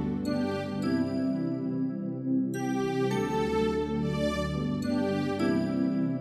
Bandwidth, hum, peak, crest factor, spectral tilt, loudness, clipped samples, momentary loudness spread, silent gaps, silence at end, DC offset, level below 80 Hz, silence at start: 13.5 kHz; none; -16 dBFS; 12 dB; -7 dB/octave; -29 LUFS; under 0.1%; 3 LU; none; 0 s; under 0.1%; -50 dBFS; 0 s